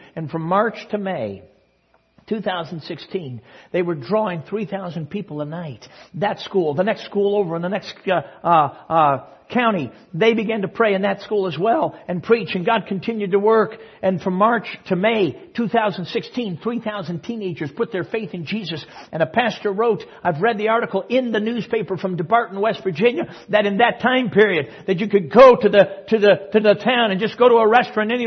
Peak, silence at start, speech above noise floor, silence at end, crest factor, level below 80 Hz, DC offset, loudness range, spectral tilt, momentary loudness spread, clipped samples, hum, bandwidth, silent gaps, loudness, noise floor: 0 dBFS; 0.15 s; 42 dB; 0 s; 20 dB; -62 dBFS; under 0.1%; 10 LU; -7 dB/octave; 12 LU; under 0.1%; none; 6.4 kHz; none; -19 LUFS; -61 dBFS